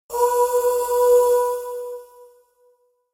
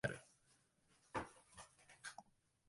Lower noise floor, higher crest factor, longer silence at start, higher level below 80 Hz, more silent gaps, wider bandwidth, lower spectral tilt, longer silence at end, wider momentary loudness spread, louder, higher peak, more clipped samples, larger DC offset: second, -61 dBFS vs -77 dBFS; second, 14 dB vs 28 dB; about the same, 0.1 s vs 0.05 s; first, -58 dBFS vs -74 dBFS; neither; first, 16.5 kHz vs 11.5 kHz; second, -1 dB/octave vs -4.5 dB/octave; first, 0.9 s vs 0.45 s; about the same, 16 LU vs 14 LU; first, -19 LUFS vs -53 LUFS; first, -8 dBFS vs -26 dBFS; neither; neither